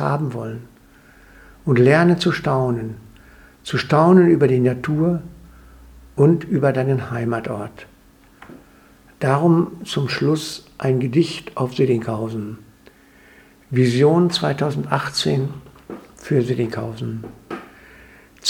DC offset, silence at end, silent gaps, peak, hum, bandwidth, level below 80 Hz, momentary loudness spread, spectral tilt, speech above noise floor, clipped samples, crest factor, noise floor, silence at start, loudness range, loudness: under 0.1%; 0 s; none; 0 dBFS; none; 15.5 kHz; -52 dBFS; 19 LU; -6.5 dB/octave; 32 dB; under 0.1%; 20 dB; -50 dBFS; 0 s; 6 LU; -19 LUFS